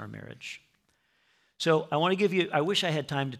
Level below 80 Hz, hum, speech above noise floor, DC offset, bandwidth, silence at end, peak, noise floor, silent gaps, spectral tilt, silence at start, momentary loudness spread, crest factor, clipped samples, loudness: -74 dBFS; none; 43 dB; under 0.1%; 15.5 kHz; 0 s; -12 dBFS; -71 dBFS; none; -5 dB/octave; 0 s; 16 LU; 18 dB; under 0.1%; -27 LUFS